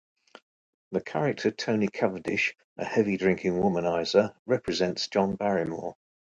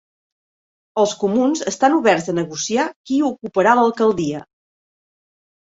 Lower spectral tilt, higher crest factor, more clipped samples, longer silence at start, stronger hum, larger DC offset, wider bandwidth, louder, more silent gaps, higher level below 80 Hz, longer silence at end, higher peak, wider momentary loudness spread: about the same, -5.5 dB/octave vs -4.5 dB/octave; about the same, 20 dB vs 18 dB; neither; about the same, 0.9 s vs 0.95 s; neither; neither; first, 9 kHz vs 8 kHz; second, -27 LUFS vs -18 LUFS; first, 2.64-2.76 s, 4.39-4.45 s vs 2.96-3.04 s; about the same, -60 dBFS vs -62 dBFS; second, 0.4 s vs 1.35 s; second, -8 dBFS vs -2 dBFS; about the same, 8 LU vs 9 LU